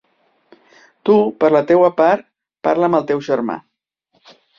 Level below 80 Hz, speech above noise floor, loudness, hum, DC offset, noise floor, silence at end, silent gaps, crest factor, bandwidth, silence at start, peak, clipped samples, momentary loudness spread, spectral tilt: -62 dBFS; 50 dB; -16 LUFS; none; under 0.1%; -65 dBFS; 1 s; none; 16 dB; 7.2 kHz; 1.05 s; -2 dBFS; under 0.1%; 11 LU; -7.5 dB/octave